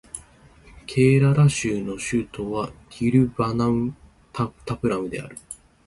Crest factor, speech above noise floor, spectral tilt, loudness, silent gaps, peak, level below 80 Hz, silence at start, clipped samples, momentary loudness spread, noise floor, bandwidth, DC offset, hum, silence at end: 18 dB; 29 dB; -6.5 dB/octave; -23 LUFS; none; -6 dBFS; -48 dBFS; 0.15 s; under 0.1%; 20 LU; -51 dBFS; 11.5 kHz; under 0.1%; none; 0.3 s